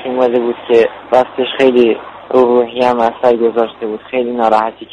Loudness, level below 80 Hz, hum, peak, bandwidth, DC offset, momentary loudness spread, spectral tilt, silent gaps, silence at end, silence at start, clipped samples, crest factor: -13 LUFS; -54 dBFS; none; 0 dBFS; 8.8 kHz; under 0.1%; 7 LU; -6 dB/octave; none; 0.05 s; 0 s; under 0.1%; 12 dB